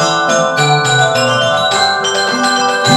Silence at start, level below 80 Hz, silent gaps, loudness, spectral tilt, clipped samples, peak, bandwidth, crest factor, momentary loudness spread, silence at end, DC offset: 0 s; -58 dBFS; none; -11 LUFS; -3 dB/octave; under 0.1%; 0 dBFS; 15.5 kHz; 12 dB; 2 LU; 0 s; under 0.1%